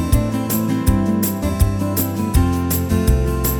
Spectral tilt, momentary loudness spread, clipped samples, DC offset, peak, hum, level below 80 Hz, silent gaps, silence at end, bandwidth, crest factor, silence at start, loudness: -6 dB/octave; 2 LU; under 0.1%; under 0.1%; -2 dBFS; none; -22 dBFS; none; 0 s; over 20 kHz; 16 dB; 0 s; -18 LUFS